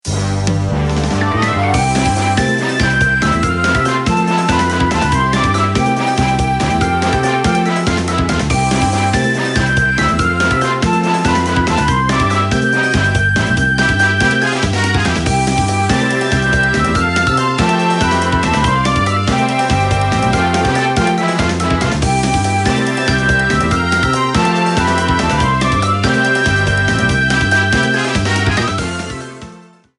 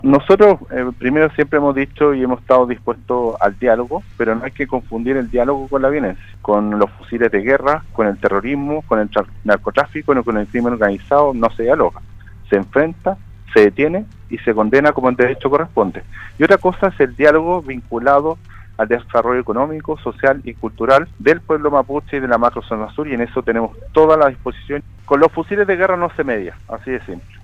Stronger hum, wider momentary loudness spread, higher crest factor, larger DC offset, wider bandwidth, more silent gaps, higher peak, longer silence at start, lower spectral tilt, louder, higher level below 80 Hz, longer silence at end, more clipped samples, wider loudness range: neither; second, 2 LU vs 11 LU; about the same, 14 dB vs 16 dB; neither; first, 11.5 kHz vs 8.4 kHz; neither; about the same, 0 dBFS vs 0 dBFS; about the same, 0.05 s vs 0 s; second, -5 dB/octave vs -8 dB/octave; about the same, -14 LUFS vs -16 LUFS; first, -28 dBFS vs -38 dBFS; first, 0.4 s vs 0.15 s; neither; about the same, 1 LU vs 3 LU